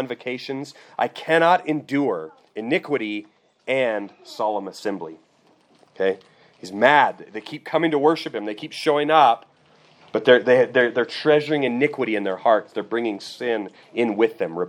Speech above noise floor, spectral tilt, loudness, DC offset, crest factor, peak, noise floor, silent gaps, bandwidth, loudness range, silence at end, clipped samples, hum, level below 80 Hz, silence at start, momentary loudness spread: 37 dB; -5.5 dB/octave; -21 LUFS; under 0.1%; 22 dB; 0 dBFS; -59 dBFS; none; 12 kHz; 7 LU; 0 s; under 0.1%; none; -80 dBFS; 0 s; 17 LU